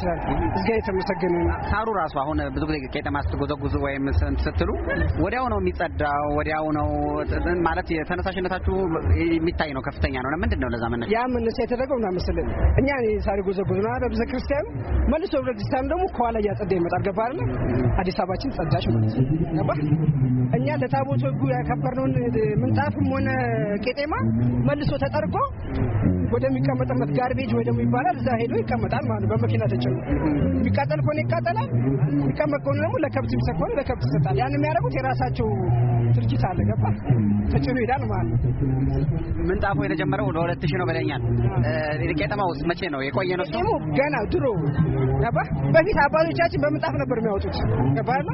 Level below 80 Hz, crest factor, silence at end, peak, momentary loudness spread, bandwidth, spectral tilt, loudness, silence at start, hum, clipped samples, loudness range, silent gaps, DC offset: -34 dBFS; 18 dB; 0 s; -4 dBFS; 4 LU; 5.8 kHz; -7 dB/octave; -23 LUFS; 0 s; none; under 0.1%; 2 LU; none; under 0.1%